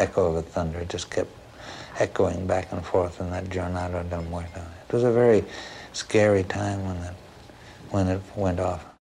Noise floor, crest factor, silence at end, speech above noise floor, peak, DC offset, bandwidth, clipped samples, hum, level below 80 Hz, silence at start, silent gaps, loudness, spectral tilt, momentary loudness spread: -46 dBFS; 18 dB; 0.2 s; 21 dB; -8 dBFS; under 0.1%; 11.5 kHz; under 0.1%; none; -52 dBFS; 0 s; none; -26 LUFS; -6 dB/octave; 18 LU